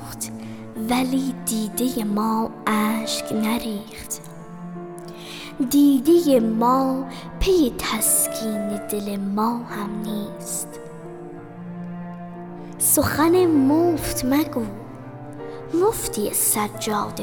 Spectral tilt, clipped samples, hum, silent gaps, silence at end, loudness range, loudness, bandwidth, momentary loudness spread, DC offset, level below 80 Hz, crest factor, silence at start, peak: -4 dB/octave; under 0.1%; none; none; 0 s; 8 LU; -21 LUFS; over 20 kHz; 19 LU; under 0.1%; -42 dBFS; 16 dB; 0 s; -6 dBFS